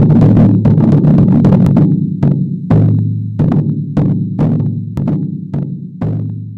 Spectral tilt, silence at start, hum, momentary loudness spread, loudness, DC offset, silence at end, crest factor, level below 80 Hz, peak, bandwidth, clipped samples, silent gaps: -11.5 dB/octave; 0 s; none; 11 LU; -12 LUFS; under 0.1%; 0 s; 8 dB; -32 dBFS; -2 dBFS; 4.3 kHz; under 0.1%; none